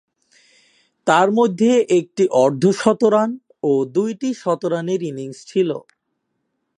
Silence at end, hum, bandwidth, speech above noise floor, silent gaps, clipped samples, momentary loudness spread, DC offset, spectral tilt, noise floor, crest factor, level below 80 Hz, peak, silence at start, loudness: 1 s; none; 11 kHz; 56 dB; none; under 0.1%; 9 LU; under 0.1%; -6 dB/octave; -73 dBFS; 18 dB; -70 dBFS; 0 dBFS; 1.05 s; -18 LUFS